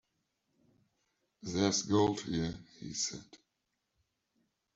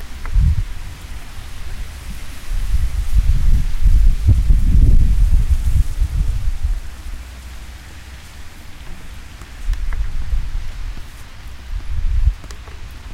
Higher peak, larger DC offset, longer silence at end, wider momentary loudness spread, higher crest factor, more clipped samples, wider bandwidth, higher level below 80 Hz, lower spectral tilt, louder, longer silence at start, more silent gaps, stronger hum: second, -14 dBFS vs -2 dBFS; neither; first, 1.4 s vs 0 s; about the same, 18 LU vs 20 LU; first, 24 dB vs 14 dB; neither; second, 8.2 kHz vs 13 kHz; second, -66 dBFS vs -18 dBFS; second, -4 dB/octave vs -6 dB/octave; second, -33 LUFS vs -20 LUFS; first, 1.45 s vs 0 s; neither; neither